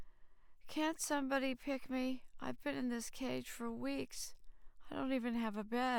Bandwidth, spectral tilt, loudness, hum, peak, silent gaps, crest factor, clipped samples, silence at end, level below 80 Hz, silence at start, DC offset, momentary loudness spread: 20 kHz; -3.5 dB/octave; -41 LUFS; none; -22 dBFS; none; 18 dB; under 0.1%; 0 s; -62 dBFS; 0 s; under 0.1%; 9 LU